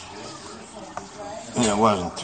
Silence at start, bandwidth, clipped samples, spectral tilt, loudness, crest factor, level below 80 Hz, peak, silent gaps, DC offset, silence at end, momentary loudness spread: 0 s; 9.2 kHz; under 0.1%; -4 dB/octave; -22 LUFS; 24 dB; -52 dBFS; -2 dBFS; none; under 0.1%; 0 s; 19 LU